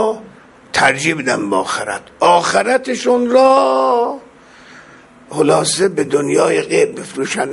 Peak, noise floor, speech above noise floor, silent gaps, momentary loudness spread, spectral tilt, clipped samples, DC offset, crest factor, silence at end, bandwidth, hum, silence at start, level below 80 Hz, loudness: 0 dBFS; -42 dBFS; 28 dB; none; 10 LU; -3.5 dB/octave; under 0.1%; under 0.1%; 16 dB; 0 s; 11.5 kHz; none; 0 s; -56 dBFS; -14 LUFS